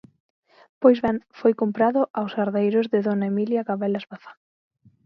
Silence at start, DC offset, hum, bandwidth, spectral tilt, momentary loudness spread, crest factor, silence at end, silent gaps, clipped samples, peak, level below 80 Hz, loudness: 0.8 s; under 0.1%; none; 5.8 kHz; -9.5 dB/octave; 8 LU; 20 dB; 0.75 s; 2.10-2.14 s; under 0.1%; -4 dBFS; -62 dBFS; -22 LUFS